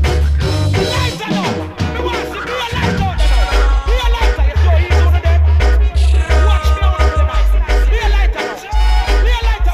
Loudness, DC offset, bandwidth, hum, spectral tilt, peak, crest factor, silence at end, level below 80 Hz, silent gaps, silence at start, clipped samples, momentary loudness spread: -15 LUFS; under 0.1%; 12.5 kHz; none; -5.5 dB/octave; 0 dBFS; 12 dB; 0 s; -14 dBFS; none; 0 s; under 0.1%; 6 LU